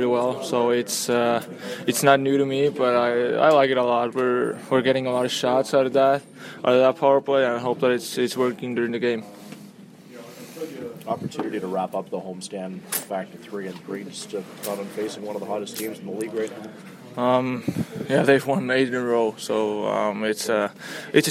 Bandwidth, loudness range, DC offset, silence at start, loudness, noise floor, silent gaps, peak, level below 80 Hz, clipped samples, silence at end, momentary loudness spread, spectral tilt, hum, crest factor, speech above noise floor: 16 kHz; 11 LU; under 0.1%; 0 s; -23 LUFS; -45 dBFS; none; -2 dBFS; -72 dBFS; under 0.1%; 0 s; 15 LU; -4.5 dB/octave; none; 22 dB; 22 dB